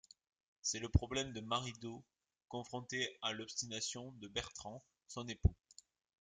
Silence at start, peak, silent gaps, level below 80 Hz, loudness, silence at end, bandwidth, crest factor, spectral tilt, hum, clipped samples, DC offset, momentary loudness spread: 0.65 s; -16 dBFS; none; -50 dBFS; -41 LUFS; 0.65 s; 9.6 kHz; 26 dB; -3.5 dB/octave; none; under 0.1%; under 0.1%; 14 LU